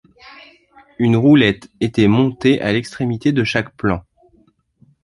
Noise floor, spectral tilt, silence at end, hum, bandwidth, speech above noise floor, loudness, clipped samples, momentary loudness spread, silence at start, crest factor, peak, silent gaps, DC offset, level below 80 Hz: -56 dBFS; -7 dB/octave; 1.05 s; none; 11.5 kHz; 41 dB; -16 LUFS; under 0.1%; 10 LU; 1 s; 16 dB; -2 dBFS; none; under 0.1%; -46 dBFS